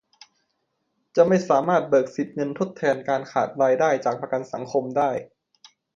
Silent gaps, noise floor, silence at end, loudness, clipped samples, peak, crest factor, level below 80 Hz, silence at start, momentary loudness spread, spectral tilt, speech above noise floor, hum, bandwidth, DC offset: none; -74 dBFS; 0.7 s; -23 LUFS; under 0.1%; -4 dBFS; 20 dB; -70 dBFS; 1.15 s; 9 LU; -6.5 dB/octave; 52 dB; none; 7.6 kHz; under 0.1%